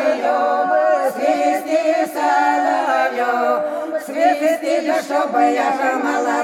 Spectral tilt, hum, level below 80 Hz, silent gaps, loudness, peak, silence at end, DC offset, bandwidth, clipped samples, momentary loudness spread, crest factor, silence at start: -3 dB/octave; none; -74 dBFS; none; -17 LUFS; -4 dBFS; 0 s; under 0.1%; 17 kHz; under 0.1%; 3 LU; 14 dB; 0 s